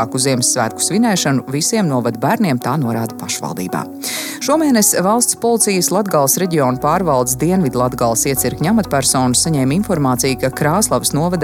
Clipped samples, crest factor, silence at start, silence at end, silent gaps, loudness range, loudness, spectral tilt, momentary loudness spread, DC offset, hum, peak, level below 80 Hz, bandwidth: under 0.1%; 14 dB; 0 s; 0 s; none; 3 LU; -15 LUFS; -4 dB/octave; 8 LU; under 0.1%; none; 0 dBFS; -42 dBFS; 17.5 kHz